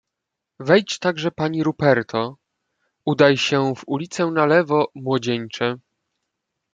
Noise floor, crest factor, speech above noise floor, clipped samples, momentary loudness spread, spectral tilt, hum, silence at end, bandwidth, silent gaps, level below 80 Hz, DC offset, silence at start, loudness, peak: -82 dBFS; 20 dB; 63 dB; under 0.1%; 10 LU; -5.5 dB/octave; none; 0.95 s; 9.2 kHz; none; -64 dBFS; under 0.1%; 0.6 s; -20 LUFS; -2 dBFS